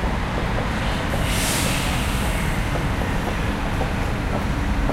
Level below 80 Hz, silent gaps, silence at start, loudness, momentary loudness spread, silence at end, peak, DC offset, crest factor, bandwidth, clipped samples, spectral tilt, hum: -26 dBFS; none; 0 s; -23 LUFS; 4 LU; 0 s; -8 dBFS; under 0.1%; 14 dB; 16 kHz; under 0.1%; -4.5 dB/octave; none